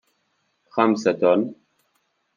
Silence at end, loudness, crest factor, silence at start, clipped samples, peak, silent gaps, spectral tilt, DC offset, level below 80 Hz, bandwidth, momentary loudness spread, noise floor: 0.85 s; -21 LUFS; 20 dB; 0.75 s; under 0.1%; -4 dBFS; none; -6 dB/octave; under 0.1%; -74 dBFS; 7.4 kHz; 11 LU; -70 dBFS